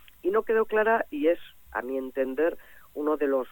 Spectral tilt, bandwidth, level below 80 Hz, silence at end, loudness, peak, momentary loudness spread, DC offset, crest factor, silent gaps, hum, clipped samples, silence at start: -6 dB/octave; 17.5 kHz; -60 dBFS; 0 s; -27 LUFS; -12 dBFS; 11 LU; under 0.1%; 16 dB; none; none; under 0.1%; 0.25 s